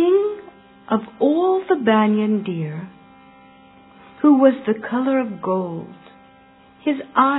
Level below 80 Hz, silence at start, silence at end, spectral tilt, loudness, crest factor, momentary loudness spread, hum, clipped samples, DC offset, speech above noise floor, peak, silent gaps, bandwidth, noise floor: -66 dBFS; 0 s; 0 s; -11 dB/octave; -19 LUFS; 18 dB; 14 LU; none; under 0.1%; under 0.1%; 31 dB; -2 dBFS; none; 4.1 kHz; -50 dBFS